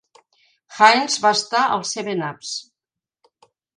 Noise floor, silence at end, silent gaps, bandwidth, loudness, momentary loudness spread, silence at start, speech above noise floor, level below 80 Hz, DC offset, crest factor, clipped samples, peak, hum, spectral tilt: -87 dBFS; 1.15 s; none; 11 kHz; -18 LUFS; 16 LU; 0.7 s; 69 dB; -74 dBFS; under 0.1%; 22 dB; under 0.1%; 0 dBFS; none; -2 dB/octave